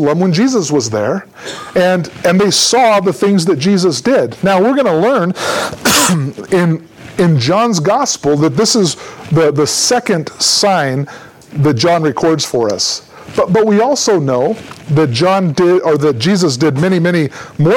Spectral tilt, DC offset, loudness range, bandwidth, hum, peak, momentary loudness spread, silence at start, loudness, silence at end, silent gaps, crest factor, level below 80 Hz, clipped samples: -4.5 dB/octave; under 0.1%; 2 LU; 19 kHz; none; 0 dBFS; 7 LU; 0 s; -12 LUFS; 0 s; none; 12 dB; -50 dBFS; under 0.1%